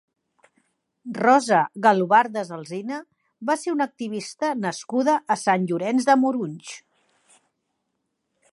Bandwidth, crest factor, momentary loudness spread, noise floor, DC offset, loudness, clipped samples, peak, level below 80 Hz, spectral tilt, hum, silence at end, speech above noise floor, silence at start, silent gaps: 11.5 kHz; 20 dB; 15 LU; -77 dBFS; under 0.1%; -22 LUFS; under 0.1%; -2 dBFS; -78 dBFS; -5 dB/octave; none; 1.75 s; 55 dB; 1.05 s; none